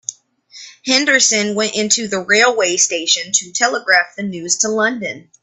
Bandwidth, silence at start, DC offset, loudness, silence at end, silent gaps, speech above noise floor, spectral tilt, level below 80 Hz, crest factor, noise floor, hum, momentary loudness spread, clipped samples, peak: 13 kHz; 0.1 s; under 0.1%; -14 LUFS; 0.2 s; none; 27 dB; -1 dB/octave; -64 dBFS; 16 dB; -43 dBFS; none; 12 LU; under 0.1%; 0 dBFS